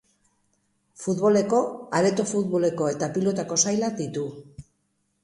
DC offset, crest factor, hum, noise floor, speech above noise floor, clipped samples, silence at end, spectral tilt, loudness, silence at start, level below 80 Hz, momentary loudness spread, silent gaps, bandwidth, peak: under 0.1%; 18 dB; none; -72 dBFS; 49 dB; under 0.1%; 0.6 s; -4.5 dB/octave; -24 LUFS; 1 s; -64 dBFS; 10 LU; none; 11.5 kHz; -6 dBFS